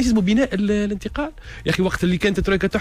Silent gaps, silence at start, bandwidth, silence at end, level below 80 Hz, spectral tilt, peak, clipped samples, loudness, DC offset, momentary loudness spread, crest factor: none; 0 s; 15 kHz; 0 s; -34 dBFS; -6 dB/octave; -8 dBFS; under 0.1%; -21 LUFS; under 0.1%; 10 LU; 12 dB